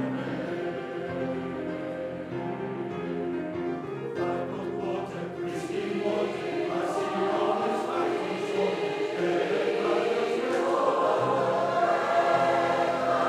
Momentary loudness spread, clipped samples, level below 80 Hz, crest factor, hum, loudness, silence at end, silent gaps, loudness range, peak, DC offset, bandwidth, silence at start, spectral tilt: 9 LU; under 0.1%; -68 dBFS; 16 dB; none; -28 LUFS; 0 s; none; 8 LU; -10 dBFS; under 0.1%; 12.5 kHz; 0 s; -6 dB/octave